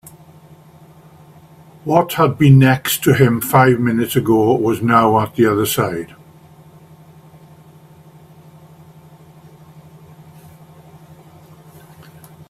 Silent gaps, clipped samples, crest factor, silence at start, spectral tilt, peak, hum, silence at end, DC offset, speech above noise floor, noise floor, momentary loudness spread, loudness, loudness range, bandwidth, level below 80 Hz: none; under 0.1%; 18 dB; 1.85 s; -6 dB/octave; 0 dBFS; none; 6.45 s; under 0.1%; 31 dB; -44 dBFS; 8 LU; -14 LUFS; 9 LU; 16 kHz; -52 dBFS